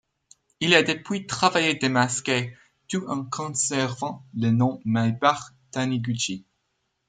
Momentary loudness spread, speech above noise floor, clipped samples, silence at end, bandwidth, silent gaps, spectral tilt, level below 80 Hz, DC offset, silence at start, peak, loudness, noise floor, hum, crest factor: 12 LU; 51 dB; under 0.1%; 0.65 s; 9.6 kHz; none; -4 dB/octave; -64 dBFS; under 0.1%; 0.6 s; -2 dBFS; -24 LUFS; -75 dBFS; none; 22 dB